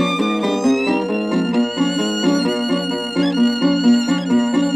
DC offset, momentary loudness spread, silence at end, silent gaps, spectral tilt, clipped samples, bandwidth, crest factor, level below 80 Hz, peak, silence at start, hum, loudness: under 0.1%; 4 LU; 0 s; none; -5 dB/octave; under 0.1%; 11 kHz; 12 dB; -56 dBFS; -4 dBFS; 0 s; none; -18 LUFS